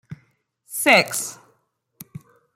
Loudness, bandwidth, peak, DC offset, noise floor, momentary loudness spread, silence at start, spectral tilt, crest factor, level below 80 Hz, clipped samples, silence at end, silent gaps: -18 LUFS; 16.5 kHz; -2 dBFS; under 0.1%; -68 dBFS; 26 LU; 0.1 s; -2 dB/octave; 24 dB; -68 dBFS; under 0.1%; 0.35 s; none